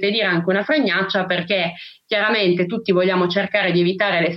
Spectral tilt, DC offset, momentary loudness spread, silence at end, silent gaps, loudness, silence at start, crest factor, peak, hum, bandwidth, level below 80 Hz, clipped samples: -7.5 dB/octave; under 0.1%; 4 LU; 0 s; none; -18 LUFS; 0 s; 14 dB; -4 dBFS; none; 6 kHz; -66 dBFS; under 0.1%